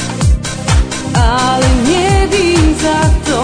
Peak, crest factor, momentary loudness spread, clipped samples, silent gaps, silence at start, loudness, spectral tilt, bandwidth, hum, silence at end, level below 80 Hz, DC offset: 0 dBFS; 10 dB; 3 LU; under 0.1%; none; 0 s; -12 LUFS; -5 dB/octave; 10 kHz; none; 0 s; -16 dBFS; under 0.1%